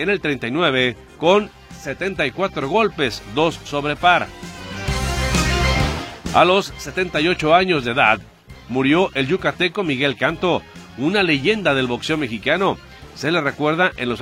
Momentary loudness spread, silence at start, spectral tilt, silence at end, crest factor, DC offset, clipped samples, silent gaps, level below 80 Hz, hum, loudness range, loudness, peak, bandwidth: 10 LU; 0 s; -5 dB/octave; 0 s; 20 dB; under 0.1%; under 0.1%; none; -34 dBFS; none; 3 LU; -19 LUFS; 0 dBFS; 16.5 kHz